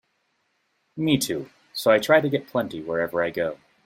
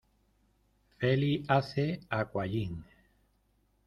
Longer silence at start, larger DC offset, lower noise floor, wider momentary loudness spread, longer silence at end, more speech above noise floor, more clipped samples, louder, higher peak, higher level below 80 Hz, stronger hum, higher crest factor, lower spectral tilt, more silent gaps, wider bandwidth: about the same, 0.95 s vs 1 s; neither; about the same, -71 dBFS vs -72 dBFS; first, 12 LU vs 8 LU; second, 0.3 s vs 1.05 s; first, 49 dB vs 41 dB; neither; first, -23 LUFS vs -32 LUFS; first, -4 dBFS vs -12 dBFS; about the same, -62 dBFS vs -60 dBFS; neither; about the same, 20 dB vs 22 dB; second, -4.5 dB/octave vs -8 dB/octave; neither; first, 16.5 kHz vs 9.8 kHz